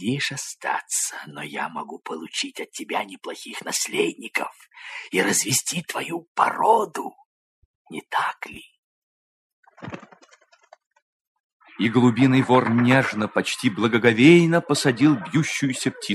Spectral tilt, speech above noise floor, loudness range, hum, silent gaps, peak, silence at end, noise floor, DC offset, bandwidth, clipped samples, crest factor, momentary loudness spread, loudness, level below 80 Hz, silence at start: -4.5 dB/octave; 34 dB; 15 LU; none; 6.28-6.35 s, 7.25-7.85 s, 8.78-9.63 s, 10.87-10.91 s, 11.02-11.60 s; -2 dBFS; 0 s; -56 dBFS; under 0.1%; 13.5 kHz; under 0.1%; 22 dB; 18 LU; -21 LUFS; -68 dBFS; 0 s